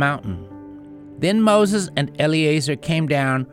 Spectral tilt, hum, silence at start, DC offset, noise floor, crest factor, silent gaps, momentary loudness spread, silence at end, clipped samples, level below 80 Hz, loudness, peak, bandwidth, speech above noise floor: -5.5 dB/octave; none; 0 s; under 0.1%; -39 dBFS; 16 dB; none; 23 LU; 0.1 s; under 0.1%; -52 dBFS; -19 LUFS; -4 dBFS; 15.5 kHz; 20 dB